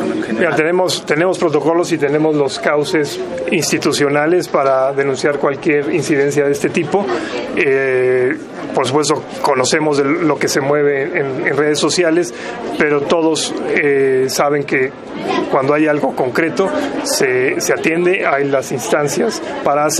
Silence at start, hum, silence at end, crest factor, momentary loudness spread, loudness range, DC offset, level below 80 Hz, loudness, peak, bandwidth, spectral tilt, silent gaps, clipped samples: 0 s; none; 0 s; 14 dB; 5 LU; 1 LU; under 0.1%; -56 dBFS; -15 LUFS; 0 dBFS; 14 kHz; -4 dB/octave; none; under 0.1%